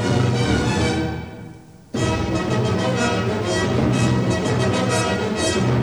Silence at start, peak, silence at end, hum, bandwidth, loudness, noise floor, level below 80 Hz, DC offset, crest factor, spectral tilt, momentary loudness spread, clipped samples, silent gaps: 0 s; -8 dBFS; 0 s; none; over 20 kHz; -20 LUFS; -41 dBFS; -38 dBFS; 0.1%; 12 dB; -5.5 dB/octave; 7 LU; under 0.1%; none